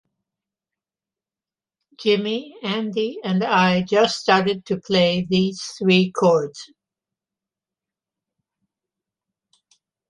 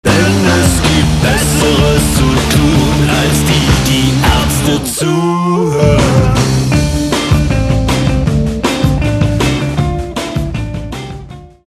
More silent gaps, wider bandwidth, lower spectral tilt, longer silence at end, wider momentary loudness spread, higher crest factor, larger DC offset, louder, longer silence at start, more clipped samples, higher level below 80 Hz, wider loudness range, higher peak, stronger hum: neither; second, 10.5 kHz vs 14 kHz; about the same, -5.5 dB/octave vs -5 dB/octave; first, 3.45 s vs 0.2 s; about the same, 9 LU vs 8 LU; first, 20 dB vs 10 dB; neither; second, -20 LUFS vs -11 LUFS; first, 2 s vs 0.05 s; neither; second, -62 dBFS vs -20 dBFS; first, 8 LU vs 4 LU; second, -4 dBFS vs 0 dBFS; neither